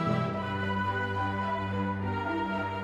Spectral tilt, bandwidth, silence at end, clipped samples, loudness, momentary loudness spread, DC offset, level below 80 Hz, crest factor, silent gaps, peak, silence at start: -7.5 dB/octave; 8.2 kHz; 0 s; under 0.1%; -31 LUFS; 2 LU; under 0.1%; -56 dBFS; 14 dB; none; -16 dBFS; 0 s